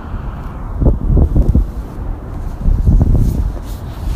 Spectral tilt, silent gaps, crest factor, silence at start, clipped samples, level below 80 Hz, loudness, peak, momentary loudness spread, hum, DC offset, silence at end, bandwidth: -9.5 dB/octave; none; 14 dB; 0 s; under 0.1%; -16 dBFS; -17 LUFS; 0 dBFS; 13 LU; none; under 0.1%; 0 s; 7.2 kHz